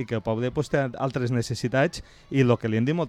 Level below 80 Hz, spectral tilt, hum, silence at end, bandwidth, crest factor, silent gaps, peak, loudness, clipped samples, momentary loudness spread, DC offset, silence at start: -52 dBFS; -6.5 dB/octave; none; 0 s; 12.5 kHz; 16 dB; none; -8 dBFS; -25 LUFS; under 0.1%; 6 LU; under 0.1%; 0 s